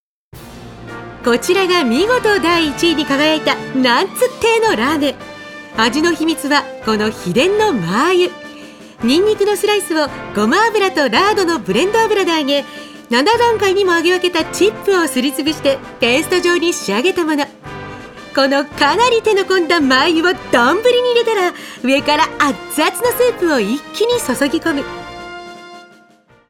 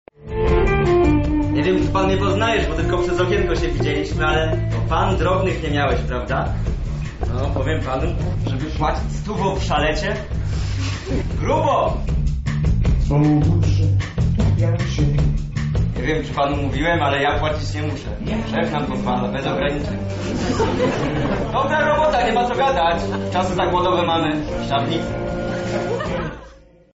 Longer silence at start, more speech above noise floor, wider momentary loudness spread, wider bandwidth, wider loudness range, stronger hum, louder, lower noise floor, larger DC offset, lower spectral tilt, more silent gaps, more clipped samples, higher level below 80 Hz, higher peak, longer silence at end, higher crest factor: first, 0.35 s vs 0.2 s; first, 35 dB vs 25 dB; first, 16 LU vs 7 LU; first, 17.5 kHz vs 8 kHz; about the same, 3 LU vs 4 LU; neither; first, -14 LUFS vs -20 LUFS; first, -49 dBFS vs -45 dBFS; neither; second, -3.5 dB/octave vs -5.5 dB/octave; neither; neither; second, -48 dBFS vs -26 dBFS; first, 0 dBFS vs -8 dBFS; first, 0.65 s vs 0.4 s; about the same, 16 dB vs 12 dB